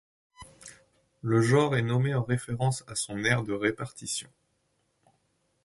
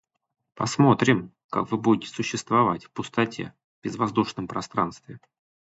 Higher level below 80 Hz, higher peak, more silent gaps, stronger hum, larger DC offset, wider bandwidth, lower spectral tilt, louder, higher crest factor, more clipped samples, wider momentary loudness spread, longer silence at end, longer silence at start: about the same, -60 dBFS vs -60 dBFS; second, -8 dBFS vs -4 dBFS; second, none vs 1.44-1.49 s, 3.64-3.82 s; neither; neither; first, 11.5 kHz vs 8.2 kHz; about the same, -5.5 dB/octave vs -5.5 dB/octave; second, -28 LUFS vs -25 LUFS; about the same, 22 dB vs 22 dB; neither; first, 18 LU vs 13 LU; first, 1.4 s vs 0.6 s; second, 0.4 s vs 0.6 s